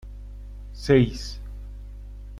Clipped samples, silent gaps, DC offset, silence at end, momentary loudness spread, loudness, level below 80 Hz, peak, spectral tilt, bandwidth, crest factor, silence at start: under 0.1%; none; under 0.1%; 0 s; 22 LU; -23 LUFS; -38 dBFS; -6 dBFS; -7 dB/octave; 12.5 kHz; 20 dB; 0.05 s